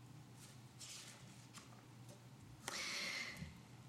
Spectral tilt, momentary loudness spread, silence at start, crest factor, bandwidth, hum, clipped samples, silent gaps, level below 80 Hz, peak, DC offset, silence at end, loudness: -2 dB/octave; 17 LU; 0 s; 26 dB; 16 kHz; none; under 0.1%; none; -76 dBFS; -26 dBFS; under 0.1%; 0 s; -49 LUFS